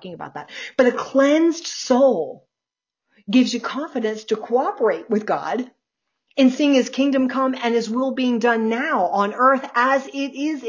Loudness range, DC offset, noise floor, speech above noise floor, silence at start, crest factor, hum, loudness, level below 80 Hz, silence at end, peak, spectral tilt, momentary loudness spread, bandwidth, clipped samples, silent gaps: 3 LU; under 0.1%; -88 dBFS; 68 dB; 0.05 s; 16 dB; none; -20 LUFS; -72 dBFS; 0 s; -4 dBFS; -4.5 dB/octave; 10 LU; 7.6 kHz; under 0.1%; none